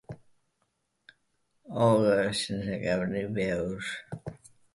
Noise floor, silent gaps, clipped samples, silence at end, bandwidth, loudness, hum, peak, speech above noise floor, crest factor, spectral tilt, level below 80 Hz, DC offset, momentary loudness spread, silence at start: -77 dBFS; none; under 0.1%; 0.4 s; 11.5 kHz; -28 LUFS; none; -12 dBFS; 49 dB; 18 dB; -5.5 dB/octave; -58 dBFS; under 0.1%; 18 LU; 0.1 s